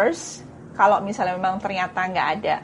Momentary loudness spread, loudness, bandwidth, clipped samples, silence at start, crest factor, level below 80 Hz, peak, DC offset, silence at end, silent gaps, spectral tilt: 16 LU; -22 LUFS; 11.5 kHz; under 0.1%; 0 s; 18 dB; -58 dBFS; -4 dBFS; under 0.1%; 0 s; none; -4 dB/octave